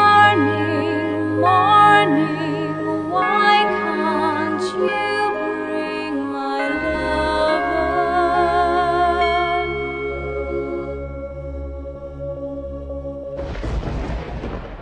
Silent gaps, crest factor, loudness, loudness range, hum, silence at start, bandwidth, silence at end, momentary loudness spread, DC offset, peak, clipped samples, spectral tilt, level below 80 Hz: none; 18 dB; -19 LUFS; 13 LU; none; 0 s; 10 kHz; 0 s; 16 LU; under 0.1%; -2 dBFS; under 0.1%; -6 dB/octave; -36 dBFS